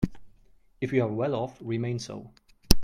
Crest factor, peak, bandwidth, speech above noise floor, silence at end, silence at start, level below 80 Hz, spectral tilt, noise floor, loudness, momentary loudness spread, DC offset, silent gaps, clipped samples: 26 dB; 0 dBFS; 16 kHz; 30 dB; 0 s; 0 s; -36 dBFS; -5.5 dB/octave; -60 dBFS; -30 LUFS; 10 LU; under 0.1%; none; under 0.1%